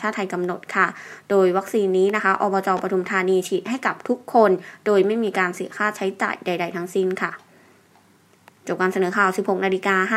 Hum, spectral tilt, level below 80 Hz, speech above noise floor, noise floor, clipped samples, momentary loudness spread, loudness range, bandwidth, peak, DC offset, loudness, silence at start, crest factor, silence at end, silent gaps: none; -5.5 dB/octave; -76 dBFS; 35 dB; -56 dBFS; under 0.1%; 7 LU; 5 LU; 14.5 kHz; -2 dBFS; under 0.1%; -21 LUFS; 0 s; 18 dB; 0 s; none